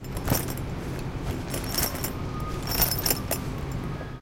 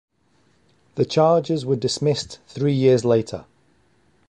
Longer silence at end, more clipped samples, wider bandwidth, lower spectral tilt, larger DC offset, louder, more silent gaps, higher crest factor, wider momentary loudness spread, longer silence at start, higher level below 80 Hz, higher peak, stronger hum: second, 0 s vs 0.85 s; neither; first, 17 kHz vs 10.5 kHz; second, -4 dB/octave vs -6 dB/octave; neither; second, -28 LUFS vs -20 LUFS; neither; about the same, 22 dB vs 18 dB; second, 10 LU vs 16 LU; second, 0 s vs 0.95 s; first, -38 dBFS vs -56 dBFS; about the same, -6 dBFS vs -4 dBFS; neither